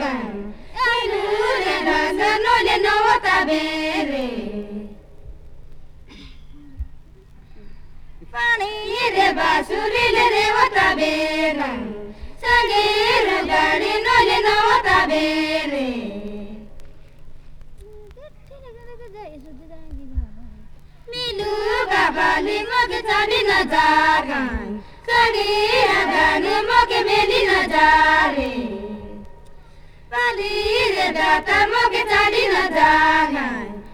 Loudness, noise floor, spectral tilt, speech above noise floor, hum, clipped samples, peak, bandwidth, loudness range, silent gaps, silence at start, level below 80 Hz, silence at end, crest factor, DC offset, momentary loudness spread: -17 LUFS; -44 dBFS; -3.5 dB/octave; 26 dB; none; under 0.1%; -2 dBFS; 19 kHz; 13 LU; none; 0 s; -40 dBFS; 0 s; 18 dB; under 0.1%; 17 LU